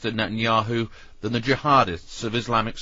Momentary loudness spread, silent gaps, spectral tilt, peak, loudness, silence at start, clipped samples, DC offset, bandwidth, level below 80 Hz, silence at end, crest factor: 11 LU; none; -5.5 dB/octave; -4 dBFS; -23 LUFS; 0 s; under 0.1%; under 0.1%; 7.8 kHz; -46 dBFS; 0 s; 18 dB